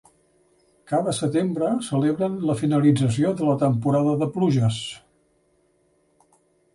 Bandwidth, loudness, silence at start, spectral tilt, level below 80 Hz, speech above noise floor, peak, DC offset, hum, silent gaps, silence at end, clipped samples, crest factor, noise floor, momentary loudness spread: 11.5 kHz; -22 LUFS; 0.9 s; -7 dB/octave; -58 dBFS; 43 dB; -6 dBFS; under 0.1%; none; none; 1.75 s; under 0.1%; 16 dB; -65 dBFS; 6 LU